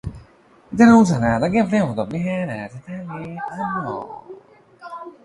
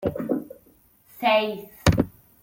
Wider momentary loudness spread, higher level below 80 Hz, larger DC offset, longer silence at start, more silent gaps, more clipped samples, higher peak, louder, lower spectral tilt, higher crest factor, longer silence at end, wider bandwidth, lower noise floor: first, 23 LU vs 9 LU; about the same, -46 dBFS vs -42 dBFS; neither; about the same, 0.05 s vs 0 s; neither; neither; about the same, -2 dBFS vs -4 dBFS; first, -18 LUFS vs -24 LUFS; first, -7 dB/octave vs -5.5 dB/octave; about the same, 18 dB vs 22 dB; second, 0.15 s vs 0.35 s; second, 11 kHz vs 17 kHz; second, -51 dBFS vs -58 dBFS